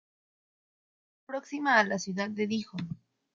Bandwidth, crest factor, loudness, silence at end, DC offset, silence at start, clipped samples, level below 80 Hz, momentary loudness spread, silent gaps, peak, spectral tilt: 7.6 kHz; 24 dB; -30 LUFS; 0.4 s; under 0.1%; 1.3 s; under 0.1%; -74 dBFS; 15 LU; none; -10 dBFS; -4.5 dB/octave